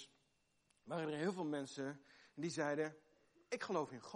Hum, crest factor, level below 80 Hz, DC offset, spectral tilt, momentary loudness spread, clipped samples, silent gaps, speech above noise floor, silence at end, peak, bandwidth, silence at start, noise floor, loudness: 50 Hz at -70 dBFS; 18 dB; -88 dBFS; under 0.1%; -5 dB/octave; 9 LU; under 0.1%; none; 37 dB; 0 s; -26 dBFS; 11.5 kHz; 0 s; -80 dBFS; -44 LUFS